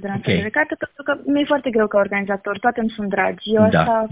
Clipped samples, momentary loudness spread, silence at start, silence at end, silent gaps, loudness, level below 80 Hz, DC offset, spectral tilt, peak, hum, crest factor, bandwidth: under 0.1%; 8 LU; 0 s; 0 s; none; -19 LUFS; -48 dBFS; under 0.1%; -10 dB/octave; -2 dBFS; none; 18 dB; 4 kHz